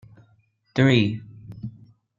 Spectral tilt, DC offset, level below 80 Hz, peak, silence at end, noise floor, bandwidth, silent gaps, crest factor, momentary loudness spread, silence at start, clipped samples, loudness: -7 dB/octave; under 0.1%; -60 dBFS; -6 dBFS; 0.5 s; -63 dBFS; 7.6 kHz; none; 20 dB; 21 LU; 0.75 s; under 0.1%; -21 LUFS